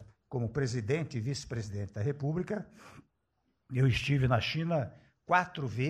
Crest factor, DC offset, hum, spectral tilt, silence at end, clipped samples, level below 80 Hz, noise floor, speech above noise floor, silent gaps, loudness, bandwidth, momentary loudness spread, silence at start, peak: 20 dB; under 0.1%; none; -6.5 dB/octave; 0 s; under 0.1%; -54 dBFS; -78 dBFS; 47 dB; none; -32 LUFS; 10.5 kHz; 10 LU; 0 s; -12 dBFS